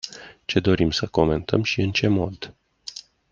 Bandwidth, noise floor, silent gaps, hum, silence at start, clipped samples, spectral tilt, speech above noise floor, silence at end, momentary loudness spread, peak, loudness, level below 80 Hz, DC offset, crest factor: 7.6 kHz; -41 dBFS; none; none; 0.05 s; under 0.1%; -6 dB/octave; 20 dB; 0.3 s; 17 LU; -2 dBFS; -22 LUFS; -46 dBFS; under 0.1%; 22 dB